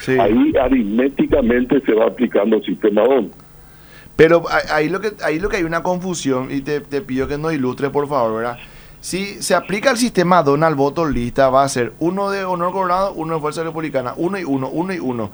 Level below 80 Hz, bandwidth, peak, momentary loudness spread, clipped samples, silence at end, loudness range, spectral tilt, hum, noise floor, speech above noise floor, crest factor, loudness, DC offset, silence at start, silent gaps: -38 dBFS; over 20 kHz; 0 dBFS; 9 LU; under 0.1%; 0 s; 4 LU; -5.5 dB/octave; none; -42 dBFS; 25 dB; 16 dB; -17 LUFS; under 0.1%; 0 s; none